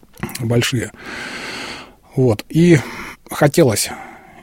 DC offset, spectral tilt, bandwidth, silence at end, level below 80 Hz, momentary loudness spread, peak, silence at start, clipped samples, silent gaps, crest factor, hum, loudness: under 0.1%; -5.5 dB/octave; 16.5 kHz; 0.25 s; -46 dBFS; 17 LU; 0 dBFS; 0.2 s; under 0.1%; none; 18 dB; none; -17 LUFS